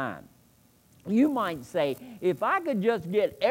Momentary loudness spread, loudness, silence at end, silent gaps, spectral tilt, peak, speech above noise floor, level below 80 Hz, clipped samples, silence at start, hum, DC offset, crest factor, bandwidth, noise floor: 8 LU; -27 LUFS; 0 s; none; -6.5 dB/octave; -12 dBFS; 34 dB; -68 dBFS; under 0.1%; 0 s; none; under 0.1%; 16 dB; 16.5 kHz; -61 dBFS